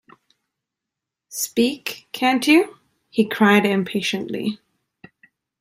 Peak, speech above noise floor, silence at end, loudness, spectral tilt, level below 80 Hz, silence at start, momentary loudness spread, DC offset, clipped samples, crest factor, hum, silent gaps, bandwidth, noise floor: -2 dBFS; 66 dB; 1.05 s; -20 LUFS; -4 dB/octave; -68 dBFS; 1.3 s; 14 LU; under 0.1%; under 0.1%; 20 dB; none; none; 16 kHz; -85 dBFS